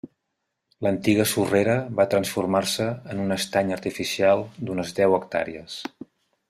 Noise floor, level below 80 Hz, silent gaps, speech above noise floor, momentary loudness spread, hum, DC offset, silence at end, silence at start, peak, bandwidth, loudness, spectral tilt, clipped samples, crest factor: -79 dBFS; -62 dBFS; none; 56 dB; 9 LU; none; under 0.1%; 0.6 s; 0.05 s; -6 dBFS; 15.5 kHz; -23 LUFS; -4.5 dB/octave; under 0.1%; 18 dB